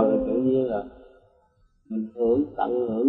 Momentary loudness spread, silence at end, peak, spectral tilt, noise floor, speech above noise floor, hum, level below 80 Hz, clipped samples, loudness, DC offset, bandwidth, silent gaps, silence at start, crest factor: 10 LU; 0 s; -8 dBFS; -11.5 dB/octave; -63 dBFS; 39 dB; none; -54 dBFS; under 0.1%; -25 LUFS; under 0.1%; 4 kHz; none; 0 s; 16 dB